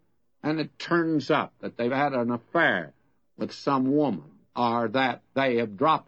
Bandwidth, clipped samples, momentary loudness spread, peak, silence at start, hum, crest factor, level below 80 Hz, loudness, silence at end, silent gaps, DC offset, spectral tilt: 8.2 kHz; under 0.1%; 12 LU; -10 dBFS; 0.45 s; none; 18 dB; -72 dBFS; -26 LUFS; 0.05 s; none; under 0.1%; -6.5 dB/octave